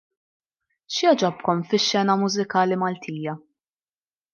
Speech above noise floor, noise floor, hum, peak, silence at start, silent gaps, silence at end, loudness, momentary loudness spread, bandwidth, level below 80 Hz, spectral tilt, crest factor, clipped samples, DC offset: over 68 dB; under -90 dBFS; none; -6 dBFS; 0.9 s; none; 0.95 s; -22 LUFS; 11 LU; 7.2 kHz; -74 dBFS; -4.5 dB/octave; 18 dB; under 0.1%; under 0.1%